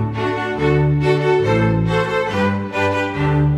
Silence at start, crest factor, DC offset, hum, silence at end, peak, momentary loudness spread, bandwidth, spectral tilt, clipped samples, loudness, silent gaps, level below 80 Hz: 0 s; 12 dB; under 0.1%; none; 0 s; -4 dBFS; 4 LU; 9.8 kHz; -7.5 dB/octave; under 0.1%; -17 LUFS; none; -36 dBFS